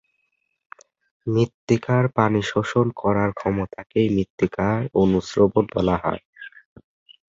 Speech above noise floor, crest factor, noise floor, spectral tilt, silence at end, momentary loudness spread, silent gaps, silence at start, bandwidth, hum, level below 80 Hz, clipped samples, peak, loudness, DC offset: 52 dB; 20 dB; -73 dBFS; -7.5 dB/octave; 0.8 s; 9 LU; 1.54-1.67 s, 4.30-4.38 s, 6.25-6.33 s; 1.25 s; 7.8 kHz; none; -46 dBFS; under 0.1%; -2 dBFS; -22 LUFS; under 0.1%